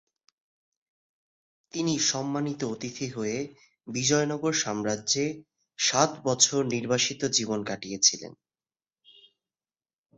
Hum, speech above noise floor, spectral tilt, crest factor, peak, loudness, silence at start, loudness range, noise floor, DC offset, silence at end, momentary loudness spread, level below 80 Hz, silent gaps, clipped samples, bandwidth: none; over 62 dB; -2.5 dB/octave; 24 dB; -6 dBFS; -26 LUFS; 1.75 s; 6 LU; under -90 dBFS; under 0.1%; 1.85 s; 12 LU; -68 dBFS; none; under 0.1%; 8.4 kHz